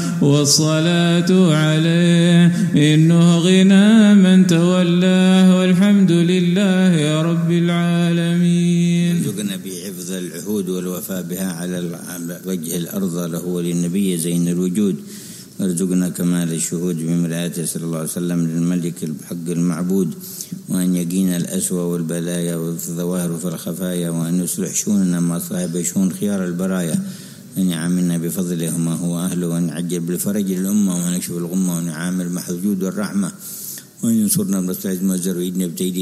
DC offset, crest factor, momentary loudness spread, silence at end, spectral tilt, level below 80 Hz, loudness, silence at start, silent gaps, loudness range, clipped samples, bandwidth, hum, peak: under 0.1%; 14 dB; 12 LU; 0 s; -5.5 dB/octave; -62 dBFS; -18 LUFS; 0 s; none; 9 LU; under 0.1%; 15.5 kHz; none; -2 dBFS